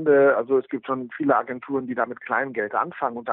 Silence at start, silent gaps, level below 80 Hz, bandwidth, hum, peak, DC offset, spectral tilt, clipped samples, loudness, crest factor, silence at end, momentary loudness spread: 0 s; none; -74 dBFS; 3.9 kHz; none; -8 dBFS; under 0.1%; -5.5 dB/octave; under 0.1%; -24 LUFS; 16 dB; 0 s; 10 LU